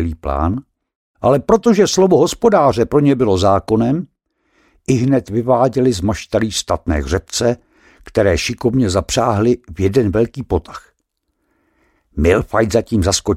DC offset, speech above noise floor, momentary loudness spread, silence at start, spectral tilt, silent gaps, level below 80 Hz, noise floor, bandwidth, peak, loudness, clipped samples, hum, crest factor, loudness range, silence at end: under 0.1%; 55 dB; 9 LU; 0 s; -5.5 dB/octave; 0.95-1.14 s; -32 dBFS; -70 dBFS; 16 kHz; -2 dBFS; -15 LUFS; under 0.1%; none; 14 dB; 5 LU; 0 s